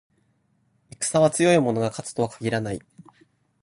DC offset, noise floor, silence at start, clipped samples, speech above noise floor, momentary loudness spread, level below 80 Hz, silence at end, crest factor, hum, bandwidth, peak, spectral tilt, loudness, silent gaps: under 0.1%; -67 dBFS; 1 s; under 0.1%; 45 dB; 10 LU; -58 dBFS; 0.85 s; 20 dB; none; 11.5 kHz; -6 dBFS; -5 dB/octave; -23 LUFS; none